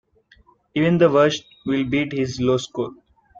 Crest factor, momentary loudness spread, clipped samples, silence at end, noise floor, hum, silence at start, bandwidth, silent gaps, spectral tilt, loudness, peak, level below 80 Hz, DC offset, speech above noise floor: 16 dB; 13 LU; under 0.1%; 0.45 s; -56 dBFS; none; 0.75 s; 7.6 kHz; none; -6 dB/octave; -21 LUFS; -4 dBFS; -54 dBFS; under 0.1%; 36 dB